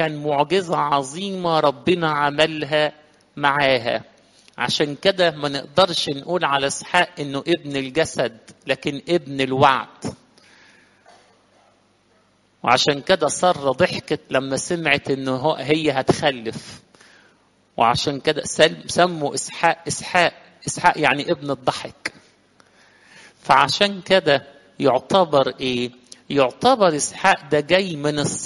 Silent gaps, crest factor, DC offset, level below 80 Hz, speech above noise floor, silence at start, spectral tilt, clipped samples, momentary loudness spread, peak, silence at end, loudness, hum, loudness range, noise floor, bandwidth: none; 20 dB; under 0.1%; -56 dBFS; 40 dB; 0 s; -4 dB/octave; under 0.1%; 9 LU; 0 dBFS; 0 s; -20 LUFS; 50 Hz at -65 dBFS; 4 LU; -60 dBFS; 11.5 kHz